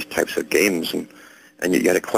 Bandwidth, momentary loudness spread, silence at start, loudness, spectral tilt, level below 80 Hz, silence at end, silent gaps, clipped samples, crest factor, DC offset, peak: 16.5 kHz; 10 LU; 0 s; -21 LUFS; -3.5 dB/octave; -56 dBFS; 0 s; none; under 0.1%; 18 dB; under 0.1%; -4 dBFS